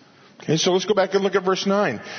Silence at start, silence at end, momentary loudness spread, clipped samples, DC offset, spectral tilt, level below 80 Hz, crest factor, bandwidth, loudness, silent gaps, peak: 0.4 s; 0 s; 4 LU; under 0.1%; under 0.1%; -4.5 dB/octave; -70 dBFS; 16 dB; 6.6 kHz; -20 LUFS; none; -6 dBFS